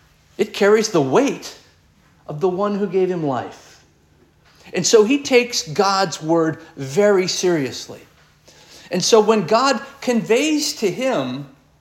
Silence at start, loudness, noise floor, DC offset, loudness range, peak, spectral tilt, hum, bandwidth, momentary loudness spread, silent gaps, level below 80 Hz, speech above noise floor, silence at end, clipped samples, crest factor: 0.4 s; -18 LUFS; -55 dBFS; under 0.1%; 5 LU; -2 dBFS; -4 dB/octave; none; 16.5 kHz; 13 LU; none; -62 dBFS; 37 dB; 0.35 s; under 0.1%; 18 dB